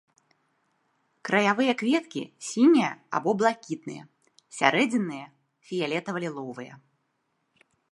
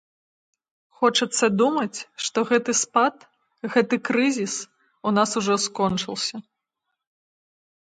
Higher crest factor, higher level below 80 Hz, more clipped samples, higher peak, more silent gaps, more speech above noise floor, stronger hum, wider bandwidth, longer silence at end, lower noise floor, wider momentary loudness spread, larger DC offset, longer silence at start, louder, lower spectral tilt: first, 26 dB vs 20 dB; second, -80 dBFS vs -66 dBFS; neither; about the same, -2 dBFS vs -4 dBFS; neither; second, 50 dB vs 58 dB; neither; first, 11.5 kHz vs 9.6 kHz; second, 1.15 s vs 1.45 s; second, -75 dBFS vs -81 dBFS; first, 19 LU vs 10 LU; neither; first, 1.25 s vs 1 s; about the same, -25 LUFS vs -23 LUFS; first, -4.5 dB/octave vs -3 dB/octave